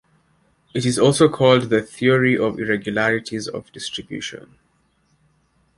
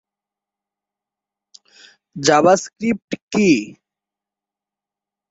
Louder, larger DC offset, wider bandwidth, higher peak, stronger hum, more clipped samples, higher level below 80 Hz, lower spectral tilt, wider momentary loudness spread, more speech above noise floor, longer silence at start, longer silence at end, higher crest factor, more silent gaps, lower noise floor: about the same, -19 LUFS vs -17 LUFS; neither; first, 11.5 kHz vs 8 kHz; about the same, -2 dBFS vs -2 dBFS; neither; neither; about the same, -56 dBFS vs -60 dBFS; about the same, -5 dB/octave vs -4.5 dB/octave; about the same, 15 LU vs 14 LU; second, 44 dB vs 71 dB; second, 0.75 s vs 2.15 s; second, 1.4 s vs 1.6 s; about the same, 20 dB vs 20 dB; second, none vs 3.04-3.08 s, 3.22-3.28 s; second, -63 dBFS vs -88 dBFS